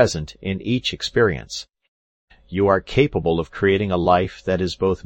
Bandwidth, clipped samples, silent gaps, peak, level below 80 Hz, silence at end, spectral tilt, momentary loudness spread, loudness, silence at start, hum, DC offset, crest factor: 8.6 kHz; under 0.1%; 1.88-2.28 s; -2 dBFS; -42 dBFS; 0.1 s; -5.5 dB/octave; 10 LU; -21 LUFS; 0 s; none; under 0.1%; 18 dB